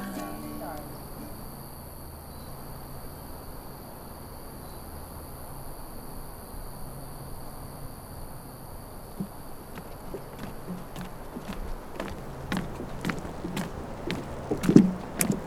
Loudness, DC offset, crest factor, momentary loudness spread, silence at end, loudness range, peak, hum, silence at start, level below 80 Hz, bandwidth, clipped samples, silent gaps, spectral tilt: -34 LUFS; under 0.1%; 32 dB; 12 LU; 0 s; 13 LU; 0 dBFS; none; 0 s; -44 dBFS; 17 kHz; under 0.1%; none; -5.5 dB/octave